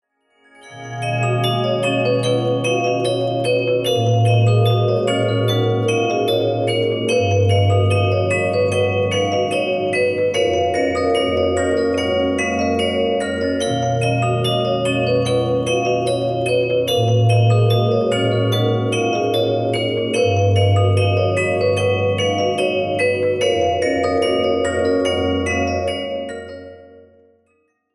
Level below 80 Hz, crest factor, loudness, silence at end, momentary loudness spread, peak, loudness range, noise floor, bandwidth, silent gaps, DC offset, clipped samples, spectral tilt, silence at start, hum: -48 dBFS; 14 dB; -18 LUFS; 1.1 s; 4 LU; -4 dBFS; 2 LU; -64 dBFS; 12 kHz; none; under 0.1%; under 0.1%; -6 dB/octave; 0.65 s; none